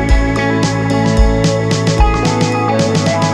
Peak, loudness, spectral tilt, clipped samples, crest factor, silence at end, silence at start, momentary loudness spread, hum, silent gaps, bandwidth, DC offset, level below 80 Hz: 0 dBFS; -13 LUFS; -5.5 dB/octave; under 0.1%; 12 dB; 0 s; 0 s; 2 LU; none; none; 11.5 kHz; under 0.1%; -18 dBFS